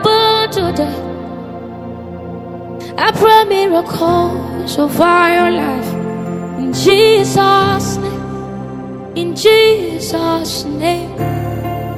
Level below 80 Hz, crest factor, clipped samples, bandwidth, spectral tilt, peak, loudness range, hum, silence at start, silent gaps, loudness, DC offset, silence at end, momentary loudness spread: -42 dBFS; 14 dB; under 0.1%; 16 kHz; -5 dB/octave; 0 dBFS; 3 LU; none; 0 s; none; -13 LUFS; under 0.1%; 0 s; 18 LU